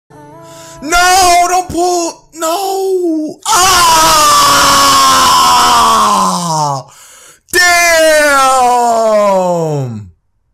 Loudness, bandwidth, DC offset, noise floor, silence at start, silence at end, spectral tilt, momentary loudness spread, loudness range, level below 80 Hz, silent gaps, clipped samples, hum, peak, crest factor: -8 LUFS; 16.5 kHz; under 0.1%; -40 dBFS; 0.3 s; 0.45 s; -2 dB/octave; 11 LU; 4 LU; -36 dBFS; none; under 0.1%; none; 0 dBFS; 10 dB